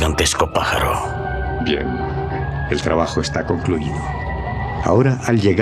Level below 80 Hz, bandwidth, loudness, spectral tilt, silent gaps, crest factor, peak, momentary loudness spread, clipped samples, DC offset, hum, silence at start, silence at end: -30 dBFS; 15.5 kHz; -19 LUFS; -5 dB/octave; none; 16 dB; -2 dBFS; 8 LU; under 0.1%; under 0.1%; none; 0 s; 0 s